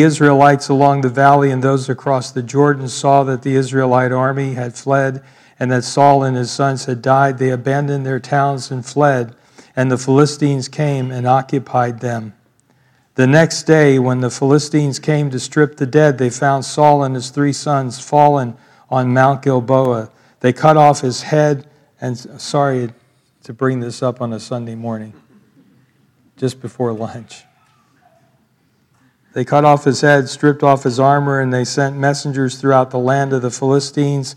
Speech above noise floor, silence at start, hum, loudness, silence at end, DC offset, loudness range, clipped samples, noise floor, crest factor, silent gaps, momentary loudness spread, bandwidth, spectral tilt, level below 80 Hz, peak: 44 dB; 0 s; none; -15 LUFS; 0.05 s; under 0.1%; 10 LU; 0.1%; -59 dBFS; 16 dB; none; 12 LU; 11.5 kHz; -6 dB/octave; -64 dBFS; 0 dBFS